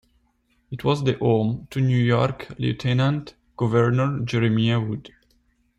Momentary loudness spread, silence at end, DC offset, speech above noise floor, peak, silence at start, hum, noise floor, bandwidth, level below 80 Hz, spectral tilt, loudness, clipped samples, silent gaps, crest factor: 9 LU; 0.7 s; under 0.1%; 45 dB; -8 dBFS; 0.7 s; none; -66 dBFS; 8.2 kHz; -52 dBFS; -7.5 dB/octave; -22 LUFS; under 0.1%; none; 16 dB